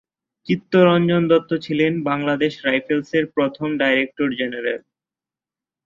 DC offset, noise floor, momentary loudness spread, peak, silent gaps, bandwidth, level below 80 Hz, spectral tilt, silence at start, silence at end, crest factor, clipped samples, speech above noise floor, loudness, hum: under 0.1%; -90 dBFS; 10 LU; -2 dBFS; none; 7.2 kHz; -60 dBFS; -7.5 dB/octave; 0.45 s; 1.05 s; 18 dB; under 0.1%; 71 dB; -19 LUFS; none